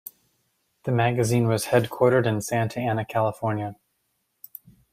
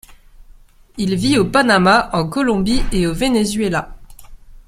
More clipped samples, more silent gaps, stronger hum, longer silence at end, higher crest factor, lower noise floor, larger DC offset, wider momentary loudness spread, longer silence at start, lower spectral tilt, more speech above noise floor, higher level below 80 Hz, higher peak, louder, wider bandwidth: neither; neither; neither; first, 1.2 s vs 0.3 s; about the same, 20 dB vs 16 dB; first, -74 dBFS vs -44 dBFS; neither; first, 22 LU vs 11 LU; first, 0.85 s vs 0.1 s; about the same, -6 dB/octave vs -5 dB/octave; first, 51 dB vs 29 dB; second, -60 dBFS vs -30 dBFS; second, -6 dBFS vs 0 dBFS; second, -24 LUFS vs -16 LUFS; about the same, 16 kHz vs 15.5 kHz